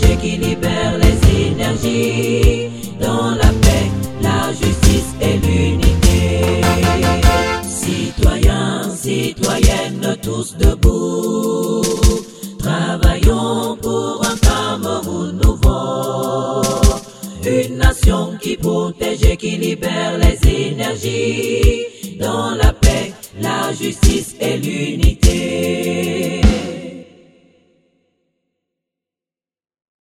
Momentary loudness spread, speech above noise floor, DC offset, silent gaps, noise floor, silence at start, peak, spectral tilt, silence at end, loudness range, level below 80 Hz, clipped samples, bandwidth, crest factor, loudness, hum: 7 LU; over 75 dB; under 0.1%; none; under -90 dBFS; 0 s; 0 dBFS; -5.5 dB/octave; 3 s; 3 LU; -20 dBFS; under 0.1%; 16.5 kHz; 16 dB; -16 LUFS; none